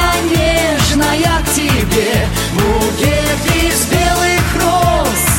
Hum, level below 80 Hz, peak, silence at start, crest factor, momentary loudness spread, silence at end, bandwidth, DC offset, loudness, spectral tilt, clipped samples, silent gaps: none; -22 dBFS; -2 dBFS; 0 s; 12 dB; 2 LU; 0 s; 17 kHz; under 0.1%; -13 LUFS; -4 dB/octave; under 0.1%; none